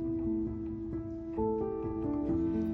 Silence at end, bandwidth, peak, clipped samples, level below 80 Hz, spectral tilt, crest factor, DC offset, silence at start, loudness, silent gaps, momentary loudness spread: 0 s; 3.2 kHz; -20 dBFS; under 0.1%; -48 dBFS; -11.5 dB/octave; 12 dB; under 0.1%; 0 s; -35 LUFS; none; 7 LU